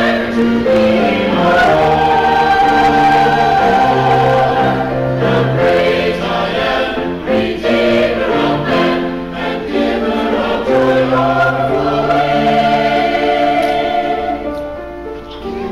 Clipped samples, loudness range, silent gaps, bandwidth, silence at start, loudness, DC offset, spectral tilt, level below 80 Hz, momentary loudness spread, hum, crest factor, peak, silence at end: under 0.1%; 4 LU; none; 15.5 kHz; 0 s; -13 LUFS; under 0.1%; -6.5 dB/octave; -36 dBFS; 9 LU; none; 8 dB; -6 dBFS; 0 s